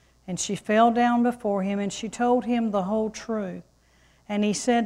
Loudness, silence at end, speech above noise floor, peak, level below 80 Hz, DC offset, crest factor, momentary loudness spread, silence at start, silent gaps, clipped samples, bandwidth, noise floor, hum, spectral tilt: -25 LUFS; 0 s; 36 dB; -8 dBFS; -60 dBFS; under 0.1%; 18 dB; 11 LU; 0.25 s; none; under 0.1%; 12 kHz; -60 dBFS; none; -5 dB/octave